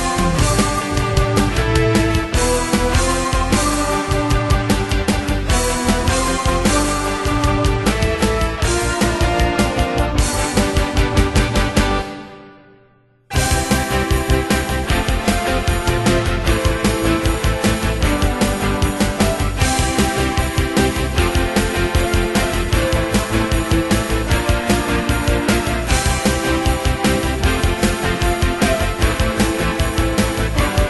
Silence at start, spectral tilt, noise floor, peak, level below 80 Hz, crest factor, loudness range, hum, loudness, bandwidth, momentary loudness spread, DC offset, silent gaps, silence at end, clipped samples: 0 s; -4.5 dB/octave; -53 dBFS; 0 dBFS; -22 dBFS; 16 dB; 2 LU; none; -17 LUFS; 12.5 kHz; 2 LU; under 0.1%; none; 0 s; under 0.1%